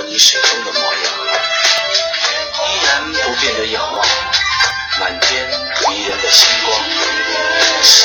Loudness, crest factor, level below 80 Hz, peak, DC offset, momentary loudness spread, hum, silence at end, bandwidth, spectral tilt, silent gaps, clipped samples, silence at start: -12 LUFS; 14 dB; -44 dBFS; 0 dBFS; under 0.1%; 8 LU; none; 0 s; over 20 kHz; 1 dB/octave; none; 0.2%; 0 s